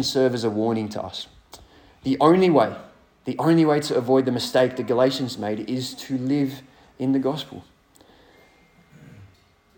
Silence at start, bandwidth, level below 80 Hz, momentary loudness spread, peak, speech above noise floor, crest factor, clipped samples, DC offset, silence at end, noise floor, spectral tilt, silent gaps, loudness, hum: 0 s; 18 kHz; -62 dBFS; 15 LU; -4 dBFS; 36 dB; 20 dB; under 0.1%; under 0.1%; 0.5 s; -57 dBFS; -6 dB/octave; none; -22 LUFS; none